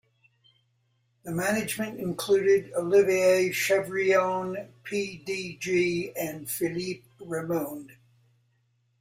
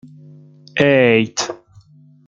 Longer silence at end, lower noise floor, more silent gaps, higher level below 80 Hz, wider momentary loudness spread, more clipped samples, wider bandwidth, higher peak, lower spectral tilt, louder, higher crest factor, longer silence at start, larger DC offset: first, 1.1 s vs 0.7 s; first, -71 dBFS vs -47 dBFS; neither; second, -68 dBFS vs -60 dBFS; about the same, 13 LU vs 14 LU; neither; first, 16 kHz vs 9.2 kHz; second, -10 dBFS vs 0 dBFS; about the same, -4.5 dB/octave vs -4.5 dB/octave; second, -27 LUFS vs -16 LUFS; about the same, 18 dB vs 18 dB; first, 1.25 s vs 0.75 s; neither